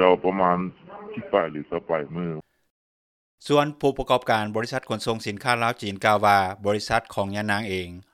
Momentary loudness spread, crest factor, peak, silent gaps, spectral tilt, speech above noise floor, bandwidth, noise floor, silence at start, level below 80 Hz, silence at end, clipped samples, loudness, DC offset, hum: 12 LU; 22 dB; -2 dBFS; 2.70-3.38 s; -5 dB/octave; over 66 dB; 15 kHz; under -90 dBFS; 0 s; -52 dBFS; 0.15 s; under 0.1%; -24 LUFS; under 0.1%; none